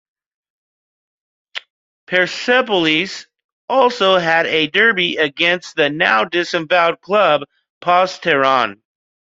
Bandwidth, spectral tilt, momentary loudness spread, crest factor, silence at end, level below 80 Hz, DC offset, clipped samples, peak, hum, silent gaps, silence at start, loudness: 7.8 kHz; -4 dB/octave; 10 LU; 16 dB; 0.65 s; -62 dBFS; under 0.1%; under 0.1%; 0 dBFS; none; 1.70-2.07 s, 3.44-3.68 s, 7.70-7.81 s; 1.55 s; -15 LUFS